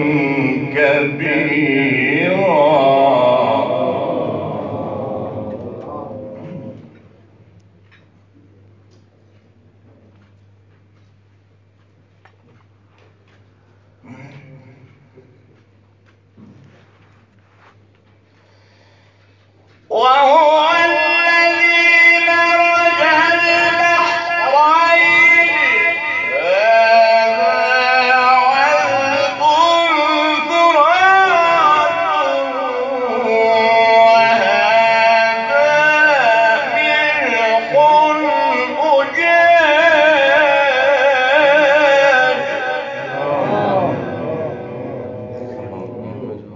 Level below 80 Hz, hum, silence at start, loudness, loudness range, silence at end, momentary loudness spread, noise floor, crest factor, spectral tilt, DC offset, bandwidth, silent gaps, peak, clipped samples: -58 dBFS; none; 0 s; -12 LUFS; 11 LU; 0 s; 15 LU; -52 dBFS; 14 dB; -4.5 dB/octave; under 0.1%; 7.6 kHz; none; 0 dBFS; under 0.1%